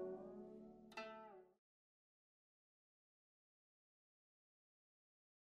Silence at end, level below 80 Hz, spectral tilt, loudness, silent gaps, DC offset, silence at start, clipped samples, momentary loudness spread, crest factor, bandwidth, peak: 3.85 s; -90 dBFS; -4 dB/octave; -56 LUFS; none; under 0.1%; 0 s; under 0.1%; 9 LU; 22 dB; 5.4 kHz; -38 dBFS